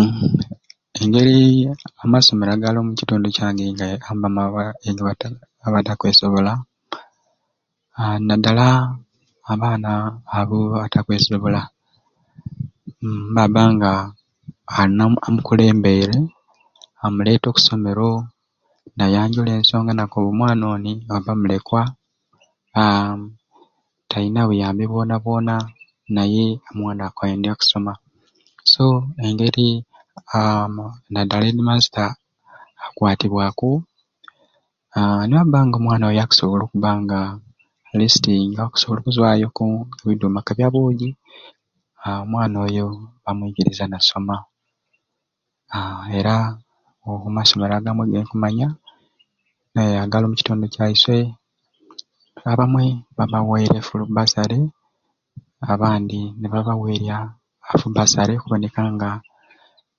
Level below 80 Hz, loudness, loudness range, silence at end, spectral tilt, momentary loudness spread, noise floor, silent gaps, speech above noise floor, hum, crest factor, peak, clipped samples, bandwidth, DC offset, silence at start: -46 dBFS; -18 LUFS; 5 LU; 0.8 s; -5.5 dB/octave; 14 LU; -79 dBFS; none; 61 dB; none; 18 dB; 0 dBFS; under 0.1%; 7.4 kHz; under 0.1%; 0 s